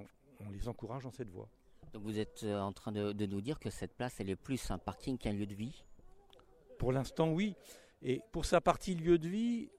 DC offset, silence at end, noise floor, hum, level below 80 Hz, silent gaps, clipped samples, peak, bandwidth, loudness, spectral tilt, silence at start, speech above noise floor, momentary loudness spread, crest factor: under 0.1%; 0 s; -63 dBFS; none; -52 dBFS; none; under 0.1%; -16 dBFS; 15 kHz; -38 LUFS; -6.5 dB/octave; 0 s; 26 dB; 16 LU; 22 dB